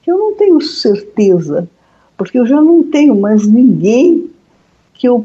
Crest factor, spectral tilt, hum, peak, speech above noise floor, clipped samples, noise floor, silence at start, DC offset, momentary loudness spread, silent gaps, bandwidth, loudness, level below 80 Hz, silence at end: 10 dB; -7 dB/octave; none; 0 dBFS; 43 dB; under 0.1%; -52 dBFS; 0.05 s; under 0.1%; 10 LU; none; 7.8 kHz; -10 LUFS; -58 dBFS; 0 s